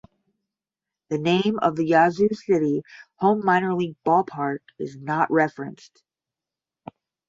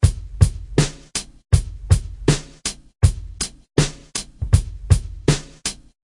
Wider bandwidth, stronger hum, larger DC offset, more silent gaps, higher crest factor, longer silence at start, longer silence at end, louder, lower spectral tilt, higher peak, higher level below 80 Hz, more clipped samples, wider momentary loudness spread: second, 7.8 kHz vs 11.5 kHz; neither; neither; neither; about the same, 20 dB vs 20 dB; first, 1.1 s vs 0 s; first, 1.55 s vs 0.3 s; about the same, -22 LUFS vs -22 LUFS; first, -7 dB/octave vs -5 dB/octave; second, -4 dBFS vs 0 dBFS; second, -66 dBFS vs -28 dBFS; neither; first, 12 LU vs 8 LU